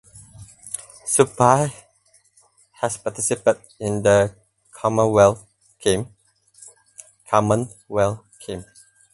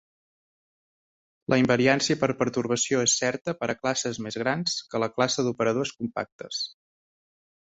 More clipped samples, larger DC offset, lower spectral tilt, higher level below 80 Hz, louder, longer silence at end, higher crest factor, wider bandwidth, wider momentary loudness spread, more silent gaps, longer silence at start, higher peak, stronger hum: neither; neither; first, -5 dB/octave vs -3.5 dB/octave; first, -52 dBFS vs -64 dBFS; first, -20 LUFS vs -26 LUFS; second, 0.5 s vs 1 s; about the same, 22 dB vs 22 dB; first, 12 kHz vs 8.2 kHz; first, 18 LU vs 10 LU; second, none vs 3.41-3.45 s, 6.32-6.39 s; second, 0.15 s vs 1.5 s; first, 0 dBFS vs -6 dBFS; neither